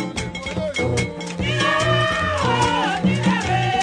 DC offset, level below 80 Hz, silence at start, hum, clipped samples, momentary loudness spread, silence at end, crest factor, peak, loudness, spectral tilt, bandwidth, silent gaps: under 0.1%; -40 dBFS; 0 s; none; under 0.1%; 8 LU; 0 s; 14 dB; -6 dBFS; -20 LUFS; -5 dB/octave; 10 kHz; none